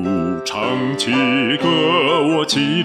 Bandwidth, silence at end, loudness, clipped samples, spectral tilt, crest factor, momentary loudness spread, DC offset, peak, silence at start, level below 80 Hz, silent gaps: 14 kHz; 0 s; -17 LUFS; under 0.1%; -4.5 dB/octave; 12 dB; 6 LU; under 0.1%; -4 dBFS; 0 s; -56 dBFS; none